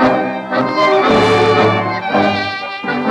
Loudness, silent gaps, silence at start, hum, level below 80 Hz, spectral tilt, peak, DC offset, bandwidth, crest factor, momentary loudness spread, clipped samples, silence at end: -14 LUFS; none; 0 s; none; -46 dBFS; -6 dB/octave; 0 dBFS; under 0.1%; 11 kHz; 12 dB; 8 LU; under 0.1%; 0 s